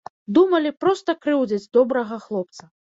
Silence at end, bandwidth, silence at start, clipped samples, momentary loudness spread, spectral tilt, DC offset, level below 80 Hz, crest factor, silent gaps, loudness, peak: 0.35 s; 7.8 kHz; 0.3 s; under 0.1%; 11 LU; -6 dB/octave; under 0.1%; -68 dBFS; 16 dB; none; -21 LUFS; -6 dBFS